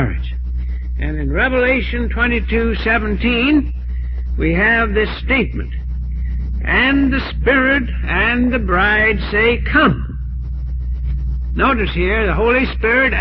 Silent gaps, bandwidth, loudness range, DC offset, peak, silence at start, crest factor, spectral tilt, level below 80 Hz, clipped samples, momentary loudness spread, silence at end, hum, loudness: none; 5.4 kHz; 3 LU; under 0.1%; -2 dBFS; 0 s; 14 dB; -9 dB/octave; -22 dBFS; under 0.1%; 11 LU; 0 s; none; -16 LUFS